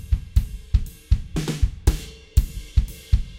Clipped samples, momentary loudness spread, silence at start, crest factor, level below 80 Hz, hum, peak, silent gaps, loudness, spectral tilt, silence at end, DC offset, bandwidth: under 0.1%; 3 LU; 0 s; 18 dB; -24 dBFS; none; -4 dBFS; none; -26 LUFS; -6 dB/octave; 0 s; under 0.1%; 16.5 kHz